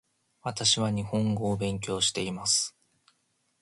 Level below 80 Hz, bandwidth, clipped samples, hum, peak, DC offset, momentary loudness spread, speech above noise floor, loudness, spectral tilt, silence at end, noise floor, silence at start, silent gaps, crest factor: -58 dBFS; 11.5 kHz; under 0.1%; none; -10 dBFS; under 0.1%; 9 LU; 45 dB; -27 LUFS; -3.5 dB/octave; 0.95 s; -74 dBFS; 0.45 s; none; 20 dB